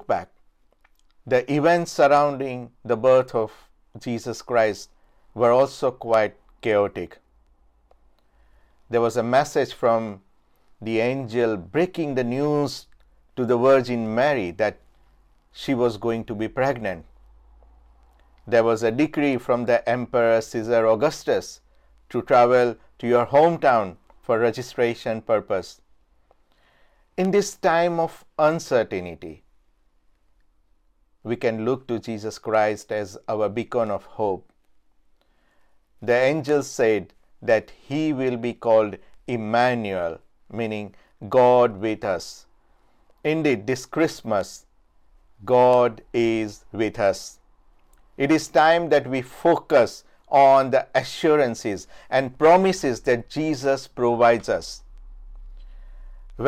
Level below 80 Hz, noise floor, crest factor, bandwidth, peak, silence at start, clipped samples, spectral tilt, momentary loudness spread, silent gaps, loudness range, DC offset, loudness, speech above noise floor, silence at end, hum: -54 dBFS; -61 dBFS; 18 dB; 15 kHz; -4 dBFS; 0.1 s; under 0.1%; -5.5 dB/octave; 14 LU; none; 7 LU; under 0.1%; -22 LUFS; 40 dB; 0 s; none